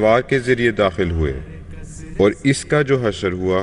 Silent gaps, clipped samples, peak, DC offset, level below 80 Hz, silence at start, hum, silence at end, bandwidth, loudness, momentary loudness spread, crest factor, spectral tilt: none; under 0.1%; -4 dBFS; under 0.1%; -34 dBFS; 0 s; none; 0 s; 11 kHz; -18 LUFS; 19 LU; 14 dB; -6 dB/octave